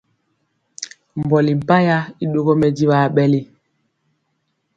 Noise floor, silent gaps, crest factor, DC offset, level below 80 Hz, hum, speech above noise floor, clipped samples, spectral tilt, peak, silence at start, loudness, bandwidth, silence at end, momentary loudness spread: -70 dBFS; none; 18 dB; under 0.1%; -54 dBFS; none; 54 dB; under 0.1%; -7 dB/octave; 0 dBFS; 0.8 s; -17 LUFS; 7.8 kHz; 1.3 s; 15 LU